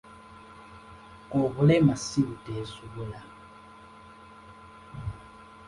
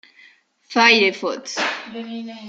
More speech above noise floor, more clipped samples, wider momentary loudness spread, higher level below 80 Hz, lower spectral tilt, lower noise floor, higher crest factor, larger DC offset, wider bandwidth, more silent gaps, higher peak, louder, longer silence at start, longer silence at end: second, 24 dB vs 33 dB; neither; first, 27 LU vs 18 LU; first, -54 dBFS vs -72 dBFS; first, -7 dB/octave vs -2 dB/octave; about the same, -50 dBFS vs -53 dBFS; about the same, 20 dB vs 20 dB; neither; first, 11.5 kHz vs 9 kHz; neither; second, -10 dBFS vs 0 dBFS; second, -28 LUFS vs -17 LUFS; second, 0.1 s vs 0.7 s; about the same, 0.05 s vs 0 s